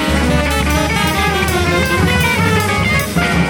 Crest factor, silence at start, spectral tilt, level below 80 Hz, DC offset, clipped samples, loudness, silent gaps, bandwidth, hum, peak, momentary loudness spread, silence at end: 14 dB; 0 s; -4.5 dB/octave; -24 dBFS; under 0.1%; under 0.1%; -14 LUFS; none; over 20 kHz; none; 0 dBFS; 2 LU; 0 s